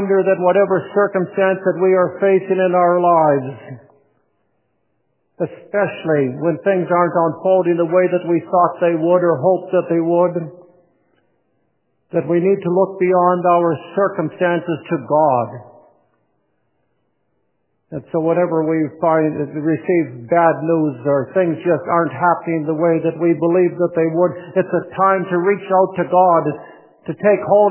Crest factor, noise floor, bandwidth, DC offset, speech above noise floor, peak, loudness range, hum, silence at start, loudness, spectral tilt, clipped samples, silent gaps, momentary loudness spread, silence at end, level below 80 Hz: 16 dB; -69 dBFS; 3.2 kHz; under 0.1%; 53 dB; 0 dBFS; 6 LU; none; 0 s; -16 LUFS; -11.5 dB/octave; under 0.1%; none; 7 LU; 0 s; -66 dBFS